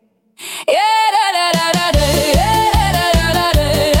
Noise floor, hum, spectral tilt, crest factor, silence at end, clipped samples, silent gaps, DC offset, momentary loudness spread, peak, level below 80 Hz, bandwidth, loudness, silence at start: -35 dBFS; none; -4 dB/octave; 10 dB; 0 s; under 0.1%; none; under 0.1%; 3 LU; -4 dBFS; -22 dBFS; 17 kHz; -13 LUFS; 0.4 s